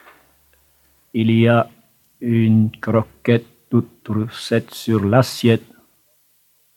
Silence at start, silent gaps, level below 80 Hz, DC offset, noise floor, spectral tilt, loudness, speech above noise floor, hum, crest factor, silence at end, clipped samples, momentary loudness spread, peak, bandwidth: 1.15 s; none; -60 dBFS; under 0.1%; -60 dBFS; -7 dB/octave; -19 LUFS; 43 dB; 50 Hz at -50 dBFS; 18 dB; 1.2 s; under 0.1%; 9 LU; -2 dBFS; 15.5 kHz